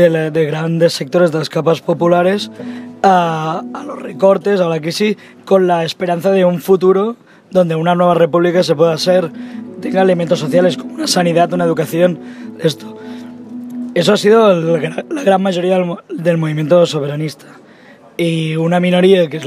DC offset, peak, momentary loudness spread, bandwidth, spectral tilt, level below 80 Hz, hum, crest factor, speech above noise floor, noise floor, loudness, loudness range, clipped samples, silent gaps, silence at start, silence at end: under 0.1%; 0 dBFS; 14 LU; 15.5 kHz; -6 dB/octave; -64 dBFS; none; 14 dB; 28 dB; -41 dBFS; -14 LUFS; 3 LU; under 0.1%; none; 0 s; 0 s